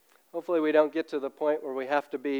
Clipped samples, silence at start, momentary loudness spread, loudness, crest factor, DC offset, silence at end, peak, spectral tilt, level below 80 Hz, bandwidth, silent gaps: under 0.1%; 0.35 s; 10 LU; -28 LUFS; 18 dB; under 0.1%; 0 s; -10 dBFS; -5.5 dB/octave; under -90 dBFS; over 20 kHz; none